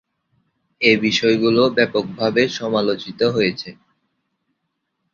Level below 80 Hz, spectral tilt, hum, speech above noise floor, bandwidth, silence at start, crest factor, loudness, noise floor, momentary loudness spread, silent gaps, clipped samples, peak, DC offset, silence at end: -58 dBFS; -5 dB/octave; none; 57 dB; 7.4 kHz; 0.8 s; 18 dB; -18 LUFS; -75 dBFS; 6 LU; none; under 0.1%; -2 dBFS; under 0.1%; 1.4 s